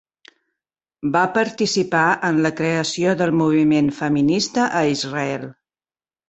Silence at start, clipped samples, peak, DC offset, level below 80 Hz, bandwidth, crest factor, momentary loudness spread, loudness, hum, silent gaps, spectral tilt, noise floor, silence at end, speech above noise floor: 1.05 s; under 0.1%; -4 dBFS; under 0.1%; -60 dBFS; 8.2 kHz; 16 dB; 7 LU; -19 LUFS; none; none; -5 dB/octave; under -90 dBFS; 0.8 s; over 71 dB